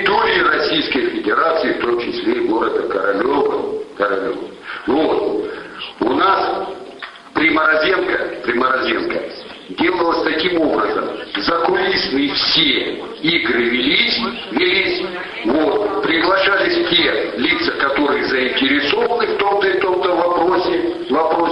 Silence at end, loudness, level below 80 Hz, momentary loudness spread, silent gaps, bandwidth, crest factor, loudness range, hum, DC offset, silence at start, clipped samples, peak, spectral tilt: 0 s; -16 LUFS; -50 dBFS; 10 LU; none; 10.5 kHz; 16 dB; 4 LU; none; under 0.1%; 0 s; under 0.1%; 0 dBFS; -5.5 dB/octave